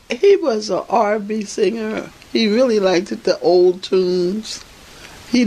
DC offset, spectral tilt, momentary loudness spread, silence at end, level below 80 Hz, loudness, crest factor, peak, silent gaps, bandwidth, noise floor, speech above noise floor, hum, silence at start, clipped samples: under 0.1%; -5 dB/octave; 12 LU; 0 s; -54 dBFS; -17 LUFS; 14 dB; -4 dBFS; none; 12 kHz; -40 dBFS; 23 dB; none; 0.1 s; under 0.1%